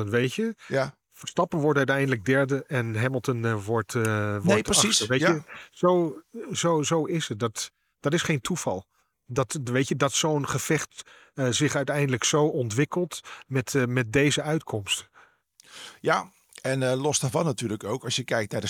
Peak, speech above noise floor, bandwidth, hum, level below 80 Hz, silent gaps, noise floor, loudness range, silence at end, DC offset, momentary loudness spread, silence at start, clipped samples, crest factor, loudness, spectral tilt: -6 dBFS; 32 dB; 18 kHz; none; -60 dBFS; none; -57 dBFS; 4 LU; 0 s; under 0.1%; 10 LU; 0 s; under 0.1%; 20 dB; -26 LUFS; -4 dB/octave